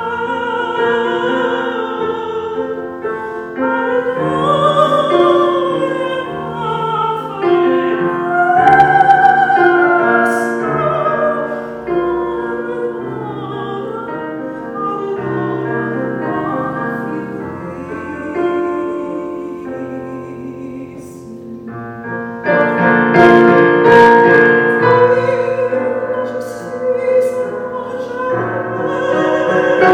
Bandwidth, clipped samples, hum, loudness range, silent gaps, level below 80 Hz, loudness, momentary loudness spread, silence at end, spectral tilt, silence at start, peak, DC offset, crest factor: 11 kHz; 0.2%; none; 12 LU; none; -50 dBFS; -14 LUFS; 16 LU; 0 s; -6.5 dB/octave; 0 s; 0 dBFS; under 0.1%; 14 dB